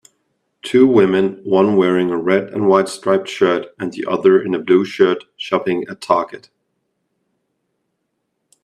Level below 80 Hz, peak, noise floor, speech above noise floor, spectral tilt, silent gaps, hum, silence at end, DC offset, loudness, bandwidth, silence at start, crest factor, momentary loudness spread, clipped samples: -64 dBFS; 0 dBFS; -72 dBFS; 57 dB; -6 dB/octave; none; none; 2.25 s; under 0.1%; -16 LUFS; 11 kHz; 0.65 s; 16 dB; 9 LU; under 0.1%